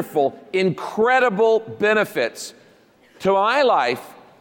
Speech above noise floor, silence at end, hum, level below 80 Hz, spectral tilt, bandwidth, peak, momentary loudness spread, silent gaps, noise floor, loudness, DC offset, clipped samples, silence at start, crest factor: 34 dB; 0.3 s; none; -64 dBFS; -4.5 dB/octave; 17 kHz; -6 dBFS; 9 LU; none; -53 dBFS; -19 LUFS; under 0.1%; under 0.1%; 0 s; 14 dB